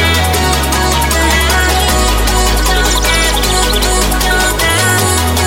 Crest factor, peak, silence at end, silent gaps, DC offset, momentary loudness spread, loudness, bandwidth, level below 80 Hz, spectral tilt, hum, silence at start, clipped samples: 10 dB; 0 dBFS; 0 s; none; under 0.1%; 2 LU; -11 LUFS; 17 kHz; -16 dBFS; -3 dB/octave; none; 0 s; under 0.1%